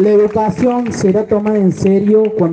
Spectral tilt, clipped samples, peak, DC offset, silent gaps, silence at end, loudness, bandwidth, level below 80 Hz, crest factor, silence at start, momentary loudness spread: -8 dB/octave; under 0.1%; -2 dBFS; under 0.1%; none; 0 s; -13 LUFS; 9 kHz; -48 dBFS; 10 dB; 0 s; 4 LU